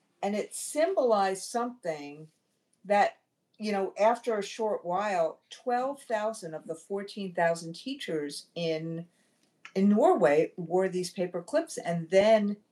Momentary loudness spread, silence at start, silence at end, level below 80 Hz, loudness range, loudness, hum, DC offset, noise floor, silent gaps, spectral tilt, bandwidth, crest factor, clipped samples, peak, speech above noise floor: 13 LU; 0.2 s; 0.15 s; -82 dBFS; 6 LU; -29 LUFS; none; under 0.1%; -57 dBFS; none; -5 dB/octave; 13.5 kHz; 18 dB; under 0.1%; -10 dBFS; 28 dB